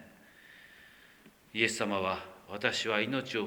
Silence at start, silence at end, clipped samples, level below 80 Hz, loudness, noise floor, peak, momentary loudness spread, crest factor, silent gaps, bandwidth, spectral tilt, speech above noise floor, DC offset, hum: 0 s; 0 s; under 0.1%; -72 dBFS; -32 LUFS; -59 dBFS; -12 dBFS; 23 LU; 24 dB; none; over 20 kHz; -3.5 dB/octave; 27 dB; under 0.1%; none